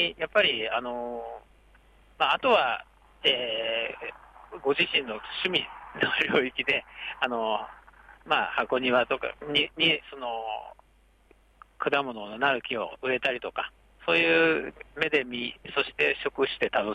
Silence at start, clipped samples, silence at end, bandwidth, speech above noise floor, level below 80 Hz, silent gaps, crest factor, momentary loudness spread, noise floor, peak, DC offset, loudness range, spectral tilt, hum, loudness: 0 s; under 0.1%; 0 s; 11 kHz; 34 dB; -60 dBFS; none; 18 dB; 12 LU; -61 dBFS; -10 dBFS; under 0.1%; 3 LU; -5 dB/octave; none; -27 LUFS